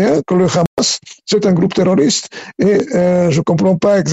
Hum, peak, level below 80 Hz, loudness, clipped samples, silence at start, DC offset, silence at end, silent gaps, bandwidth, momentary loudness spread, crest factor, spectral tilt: none; -4 dBFS; -48 dBFS; -14 LUFS; under 0.1%; 0 s; under 0.1%; 0 s; 0.67-0.77 s; 8.2 kHz; 5 LU; 10 dB; -5.5 dB/octave